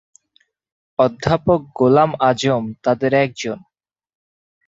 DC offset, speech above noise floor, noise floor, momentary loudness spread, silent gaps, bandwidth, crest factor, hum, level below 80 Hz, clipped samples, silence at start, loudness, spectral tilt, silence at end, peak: under 0.1%; 45 dB; -62 dBFS; 13 LU; none; 8 kHz; 18 dB; none; -50 dBFS; under 0.1%; 1 s; -17 LUFS; -6 dB/octave; 1.1 s; -2 dBFS